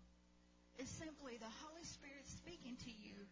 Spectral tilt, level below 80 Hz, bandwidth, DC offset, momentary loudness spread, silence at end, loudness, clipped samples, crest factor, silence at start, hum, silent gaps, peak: -3.5 dB/octave; -70 dBFS; 7.8 kHz; under 0.1%; 4 LU; 0 s; -55 LUFS; under 0.1%; 16 dB; 0 s; 60 Hz at -70 dBFS; none; -42 dBFS